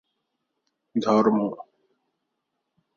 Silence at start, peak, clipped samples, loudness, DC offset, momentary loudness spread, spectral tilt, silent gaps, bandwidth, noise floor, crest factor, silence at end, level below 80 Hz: 0.95 s; -6 dBFS; under 0.1%; -23 LUFS; under 0.1%; 12 LU; -7 dB/octave; none; 7 kHz; -80 dBFS; 22 dB; 1.35 s; -72 dBFS